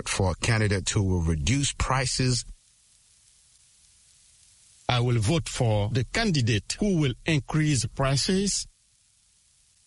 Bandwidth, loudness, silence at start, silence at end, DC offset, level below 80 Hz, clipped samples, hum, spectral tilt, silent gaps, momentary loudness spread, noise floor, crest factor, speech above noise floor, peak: 11.5 kHz; -25 LUFS; 0 s; 1.2 s; under 0.1%; -40 dBFS; under 0.1%; none; -4.5 dB/octave; none; 3 LU; -64 dBFS; 18 dB; 39 dB; -8 dBFS